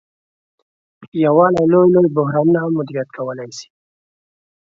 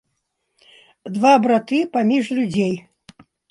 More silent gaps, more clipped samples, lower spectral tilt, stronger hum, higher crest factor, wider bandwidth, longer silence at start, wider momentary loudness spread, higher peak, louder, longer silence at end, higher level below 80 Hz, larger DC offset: first, 1.08-1.12 s vs none; neither; first, -8 dB/octave vs -6 dB/octave; neither; about the same, 18 dB vs 18 dB; second, 7.6 kHz vs 11.5 kHz; about the same, 1 s vs 1.05 s; about the same, 16 LU vs 15 LU; about the same, 0 dBFS vs -2 dBFS; first, -15 LUFS vs -18 LUFS; first, 1.1 s vs 0.7 s; about the same, -60 dBFS vs -64 dBFS; neither